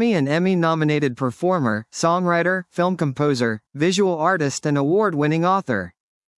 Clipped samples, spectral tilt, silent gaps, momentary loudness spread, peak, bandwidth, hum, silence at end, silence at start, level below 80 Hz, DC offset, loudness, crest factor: under 0.1%; -6 dB/octave; none; 5 LU; -4 dBFS; 12 kHz; none; 0.5 s; 0 s; -68 dBFS; under 0.1%; -20 LUFS; 16 dB